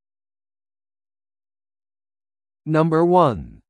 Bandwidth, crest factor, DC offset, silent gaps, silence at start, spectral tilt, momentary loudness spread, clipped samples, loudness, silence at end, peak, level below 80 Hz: 9.8 kHz; 20 dB; under 0.1%; none; 2.65 s; -9 dB/octave; 9 LU; under 0.1%; -18 LUFS; 0.2 s; -2 dBFS; -52 dBFS